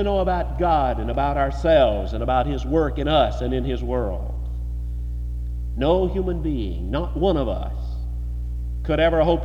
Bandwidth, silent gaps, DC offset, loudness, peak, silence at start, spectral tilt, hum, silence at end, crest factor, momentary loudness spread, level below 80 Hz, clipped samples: 6.8 kHz; none; under 0.1%; -23 LUFS; -6 dBFS; 0 s; -8 dB/octave; 60 Hz at -25 dBFS; 0 s; 16 dB; 12 LU; -26 dBFS; under 0.1%